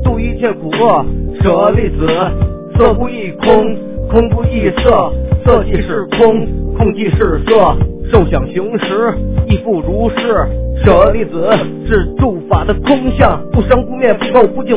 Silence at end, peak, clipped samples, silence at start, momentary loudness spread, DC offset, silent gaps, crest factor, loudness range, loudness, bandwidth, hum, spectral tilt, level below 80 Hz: 0 s; 0 dBFS; 0.8%; 0 s; 6 LU; under 0.1%; none; 10 dB; 1 LU; -12 LUFS; 4 kHz; none; -11 dB/octave; -20 dBFS